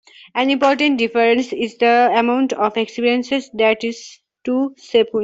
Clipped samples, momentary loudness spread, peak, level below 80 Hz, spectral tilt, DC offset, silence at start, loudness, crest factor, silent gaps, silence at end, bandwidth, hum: under 0.1%; 9 LU; -2 dBFS; -62 dBFS; -4 dB/octave; under 0.1%; 0.35 s; -17 LUFS; 16 dB; none; 0 s; 7.8 kHz; none